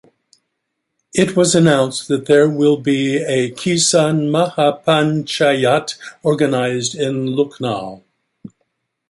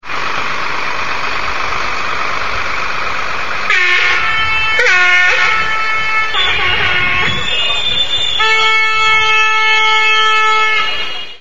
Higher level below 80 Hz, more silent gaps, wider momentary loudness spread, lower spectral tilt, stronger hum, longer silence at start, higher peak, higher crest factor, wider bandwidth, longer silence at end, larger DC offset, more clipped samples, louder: second, -58 dBFS vs -38 dBFS; neither; about the same, 8 LU vs 9 LU; first, -4.5 dB/octave vs -1.5 dB/octave; neither; first, 1.15 s vs 0 s; about the same, 0 dBFS vs 0 dBFS; about the same, 16 dB vs 14 dB; second, 11.5 kHz vs 15 kHz; first, 0.65 s vs 0 s; second, under 0.1% vs 10%; neither; second, -16 LUFS vs -12 LUFS